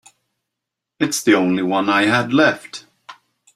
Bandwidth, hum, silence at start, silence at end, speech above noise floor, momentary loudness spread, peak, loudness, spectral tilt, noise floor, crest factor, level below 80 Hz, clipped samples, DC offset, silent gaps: 16 kHz; none; 1 s; 0.45 s; 65 dB; 14 LU; 0 dBFS; -17 LUFS; -4 dB/octave; -82 dBFS; 18 dB; -64 dBFS; under 0.1%; under 0.1%; none